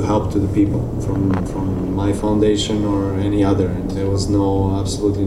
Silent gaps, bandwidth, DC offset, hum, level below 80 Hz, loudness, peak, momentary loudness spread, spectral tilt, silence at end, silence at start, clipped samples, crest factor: none; 12 kHz; under 0.1%; none; -30 dBFS; -19 LUFS; -4 dBFS; 5 LU; -7 dB/octave; 0 s; 0 s; under 0.1%; 14 dB